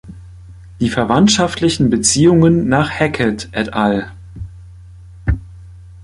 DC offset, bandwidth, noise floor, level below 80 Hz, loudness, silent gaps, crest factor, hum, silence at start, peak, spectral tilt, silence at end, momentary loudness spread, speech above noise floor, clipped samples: under 0.1%; 11.5 kHz; -37 dBFS; -32 dBFS; -15 LUFS; none; 16 dB; none; 0.05 s; 0 dBFS; -5 dB/octave; 0 s; 18 LU; 24 dB; under 0.1%